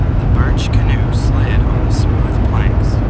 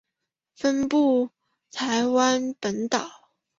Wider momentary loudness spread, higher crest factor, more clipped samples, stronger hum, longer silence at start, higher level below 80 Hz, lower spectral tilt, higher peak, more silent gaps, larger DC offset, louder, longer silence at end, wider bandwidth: second, 1 LU vs 11 LU; second, 12 dB vs 18 dB; neither; neither; second, 0 s vs 0.6 s; first, -16 dBFS vs -66 dBFS; first, -7.5 dB/octave vs -3.5 dB/octave; first, -2 dBFS vs -8 dBFS; neither; first, 0.7% vs under 0.1%; first, -15 LUFS vs -24 LUFS; second, 0 s vs 0.5 s; about the same, 8 kHz vs 7.8 kHz